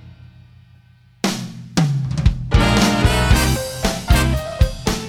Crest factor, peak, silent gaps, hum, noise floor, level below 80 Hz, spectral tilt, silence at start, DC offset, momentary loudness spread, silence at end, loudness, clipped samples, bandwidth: 16 dB; -2 dBFS; none; none; -49 dBFS; -22 dBFS; -5 dB/octave; 0.05 s; under 0.1%; 8 LU; 0 s; -18 LUFS; under 0.1%; 18 kHz